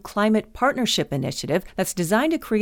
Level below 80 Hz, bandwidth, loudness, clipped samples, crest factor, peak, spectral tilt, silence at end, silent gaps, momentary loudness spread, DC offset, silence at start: -48 dBFS; 19 kHz; -23 LUFS; under 0.1%; 18 dB; -6 dBFS; -4.5 dB/octave; 0 s; none; 5 LU; under 0.1%; 0.05 s